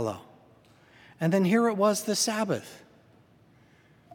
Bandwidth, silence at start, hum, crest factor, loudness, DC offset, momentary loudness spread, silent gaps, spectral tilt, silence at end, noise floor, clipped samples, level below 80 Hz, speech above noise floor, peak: 17.5 kHz; 0 s; none; 18 dB; -26 LUFS; under 0.1%; 12 LU; none; -4.5 dB/octave; 1.4 s; -59 dBFS; under 0.1%; -76 dBFS; 33 dB; -10 dBFS